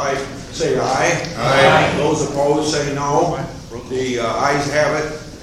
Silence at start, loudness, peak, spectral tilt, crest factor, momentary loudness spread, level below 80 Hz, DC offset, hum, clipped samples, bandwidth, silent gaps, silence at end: 0 s; -17 LUFS; 0 dBFS; -4.5 dB/octave; 18 dB; 13 LU; -42 dBFS; under 0.1%; none; under 0.1%; 14 kHz; none; 0 s